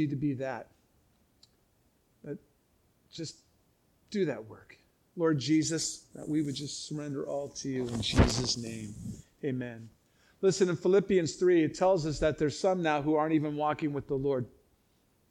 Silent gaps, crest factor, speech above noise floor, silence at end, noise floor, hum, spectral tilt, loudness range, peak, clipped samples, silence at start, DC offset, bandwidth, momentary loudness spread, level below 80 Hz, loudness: none; 22 dB; 40 dB; 0.8 s; -70 dBFS; none; -5 dB/octave; 13 LU; -8 dBFS; under 0.1%; 0 s; under 0.1%; 12.5 kHz; 17 LU; -48 dBFS; -30 LUFS